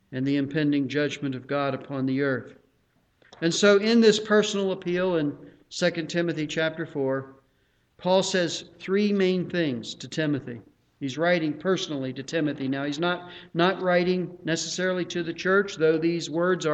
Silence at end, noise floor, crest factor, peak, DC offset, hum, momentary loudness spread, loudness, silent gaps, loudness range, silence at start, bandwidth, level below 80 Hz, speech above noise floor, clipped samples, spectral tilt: 0 s; -67 dBFS; 20 dB; -6 dBFS; under 0.1%; none; 10 LU; -25 LUFS; none; 5 LU; 0.1 s; 9 kHz; -66 dBFS; 42 dB; under 0.1%; -5 dB/octave